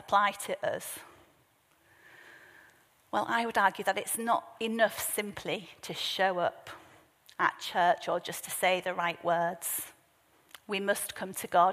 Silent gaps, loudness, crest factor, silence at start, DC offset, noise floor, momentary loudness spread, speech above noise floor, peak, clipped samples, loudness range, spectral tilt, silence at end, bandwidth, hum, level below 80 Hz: none; -31 LUFS; 20 dB; 0.1 s; under 0.1%; -67 dBFS; 11 LU; 37 dB; -12 dBFS; under 0.1%; 4 LU; -2.5 dB/octave; 0 s; 15.5 kHz; none; -74 dBFS